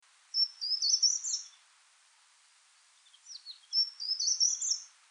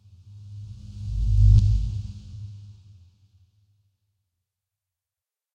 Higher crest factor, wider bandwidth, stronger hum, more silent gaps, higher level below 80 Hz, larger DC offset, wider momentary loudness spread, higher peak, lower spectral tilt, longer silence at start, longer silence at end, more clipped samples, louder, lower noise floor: about the same, 18 dB vs 20 dB; first, 10 kHz vs 7 kHz; neither; neither; second, under -90 dBFS vs -28 dBFS; neither; second, 21 LU vs 25 LU; second, -16 dBFS vs -6 dBFS; second, 11 dB/octave vs -8 dB/octave; about the same, 0.35 s vs 0.35 s; second, 0.25 s vs 2.85 s; neither; second, -29 LUFS vs -22 LUFS; second, -65 dBFS vs under -90 dBFS